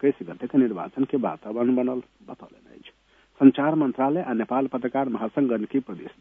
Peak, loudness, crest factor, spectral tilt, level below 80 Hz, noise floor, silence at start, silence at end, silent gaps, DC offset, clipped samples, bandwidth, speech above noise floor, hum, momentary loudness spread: -2 dBFS; -24 LUFS; 22 dB; -10 dB/octave; -68 dBFS; -59 dBFS; 0 s; 0.1 s; none; under 0.1%; under 0.1%; 3.7 kHz; 36 dB; none; 15 LU